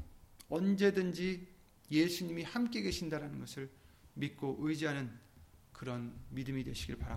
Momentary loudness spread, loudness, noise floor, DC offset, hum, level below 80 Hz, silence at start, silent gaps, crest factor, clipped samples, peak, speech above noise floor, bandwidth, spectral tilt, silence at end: 16 LU; -37 LUFS; -61 dBFS; under 0.1%; none; -56 dBFS; 0 s; none; 20 dB; under 0.1%; -18 dBFS; 24 dB; 16.5 kHz; -5.5 dB/octave; 0 s